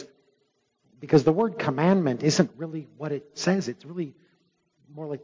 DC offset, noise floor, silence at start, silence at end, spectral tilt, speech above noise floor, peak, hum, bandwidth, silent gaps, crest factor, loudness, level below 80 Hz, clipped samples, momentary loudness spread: under 0.1%; -72 dBFS; 0 s; 0.05 s; -6 dB/octave; 47 dB; -6 dBFS; none; 7.6 kHz; none; 20 dB; -25 LUFS; -66 dBFS; under 0.1%; 15 LU